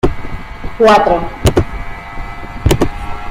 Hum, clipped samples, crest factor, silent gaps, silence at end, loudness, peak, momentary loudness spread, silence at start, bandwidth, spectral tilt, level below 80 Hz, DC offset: none; under 0.1%; 14 dB; none; 0 s; -13 LUFS; 0 dBFS; 19 LU; 0.05 s; 16 kHz; -6 dB/octave; -24 dBFS; under 0.1%